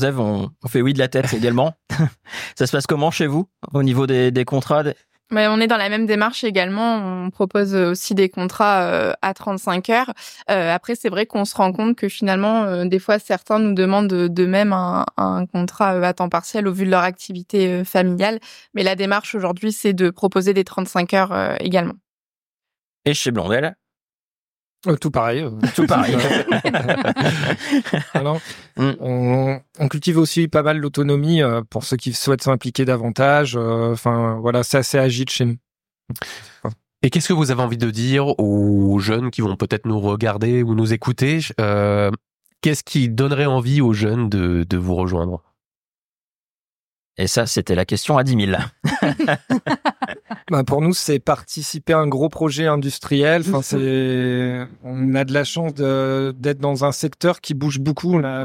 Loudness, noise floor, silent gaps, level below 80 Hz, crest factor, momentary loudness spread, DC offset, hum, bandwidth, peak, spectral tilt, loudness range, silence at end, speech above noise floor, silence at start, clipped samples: -19 LUFS; under -90 dBFS; 22.09-22.58 s, 22.84-23.01 s, 24.01-24.53 s, 24.59-24.77 s, 42.35-42.40 s, 45.66-45.71 s, 45.77-45.92 s, 45.98-47.10 s; -50 dBFS; 18 dB; 6 LU; under 0.1%; none; 16.5 kHz; -2 dBFS; -5.5 dB/octave; 3 LU; 0 s; over 72 dB; 0 s; under 0.1%